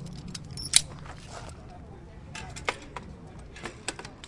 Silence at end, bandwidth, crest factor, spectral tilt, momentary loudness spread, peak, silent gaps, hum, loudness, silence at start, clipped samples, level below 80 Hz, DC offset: 0 s; 11.5 kHz; 34 dB; -1.5 dB/octave; 23 LU; 0 dBFS; none; none; -30 LUFS; 0 s; under 0.1%; -50 dBFS; under 0.1%